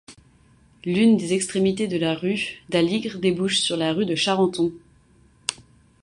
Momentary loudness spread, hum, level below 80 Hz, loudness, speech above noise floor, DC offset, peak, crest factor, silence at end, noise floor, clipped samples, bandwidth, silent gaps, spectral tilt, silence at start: 10 LU; none; -58 dBFS; -22 LUFS; 34 dB; under 0.1%; -2 dBFS; 22 dB; 0.5 s; -56 dBFS; under 0.1%; 11.5 kHz; none; -4.5 dB/octave; 0.1 s